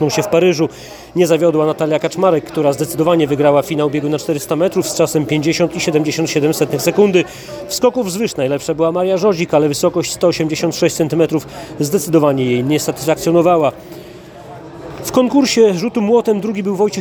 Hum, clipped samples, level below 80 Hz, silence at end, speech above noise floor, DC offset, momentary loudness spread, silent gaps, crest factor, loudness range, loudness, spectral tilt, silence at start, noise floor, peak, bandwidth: none; under 0.1%; -50 dBFS; 0 s; 20 dB; under 0.1%; 9 LU; none; 14 dB; 1 LU; -15 LUFS; -5 dB/octave; 0 s; -35 dBFS; 0 dBFS; over 20 kHz